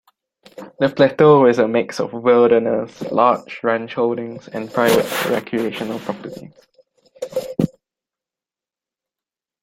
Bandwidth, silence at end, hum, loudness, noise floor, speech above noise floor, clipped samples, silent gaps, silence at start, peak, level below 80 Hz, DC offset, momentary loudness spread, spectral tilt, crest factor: 16.5 kHz; 1.95 s; none; -17 LUFS; -90 dBFS; 73 dB; under 0.1%; none; 0.6 s; -2 dBFS; -60 dBFS; under 0.1%; 15 LU; -6 dB/octave; 18 dB